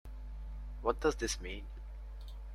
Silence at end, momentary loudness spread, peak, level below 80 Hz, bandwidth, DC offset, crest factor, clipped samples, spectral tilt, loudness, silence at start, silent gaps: 0 s; 16 LU; -16 dBFS; -44 dBFS; 13.5 kHz; under 0.1%; 24 dB; under 0.1%; -4 dB/octave; -38 LUFS; 0.05 s; none